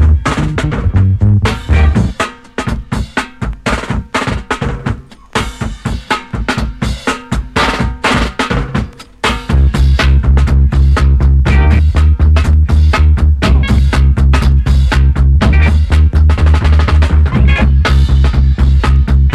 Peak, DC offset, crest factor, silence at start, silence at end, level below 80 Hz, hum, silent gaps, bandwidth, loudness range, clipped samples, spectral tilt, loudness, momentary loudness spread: 0 dBFS; under 0.1%; 10 dB; 0 s; 0 s; -12 dBFS; none; none; 10.5 kHz; 8 LU; under 0.1%; -6.5 dB/octave; -12 LUFS; 9 LU